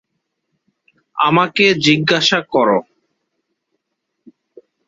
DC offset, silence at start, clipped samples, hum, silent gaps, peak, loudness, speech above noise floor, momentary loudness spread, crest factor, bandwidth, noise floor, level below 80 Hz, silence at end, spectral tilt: under 0.1%; 1.15 s; under 0.1%; none; none; 0 dBFS; -14 LUFS; 61 dB; 6 LU; 18 dB; 8 kHz; -75 dBFS; -60 dBFS; 2.05 s; -4.5 dB/octave